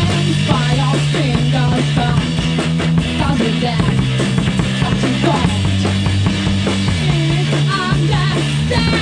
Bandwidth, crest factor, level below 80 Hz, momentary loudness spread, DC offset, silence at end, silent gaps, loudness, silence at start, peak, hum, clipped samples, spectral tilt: 10 kHz; 14 dB; -30 dBFS; 2 LU; under 0.1%; 0 s; none; -15 LUFS; 0 s; 0 dBFS; none; under 0.1%; -6 dB/octave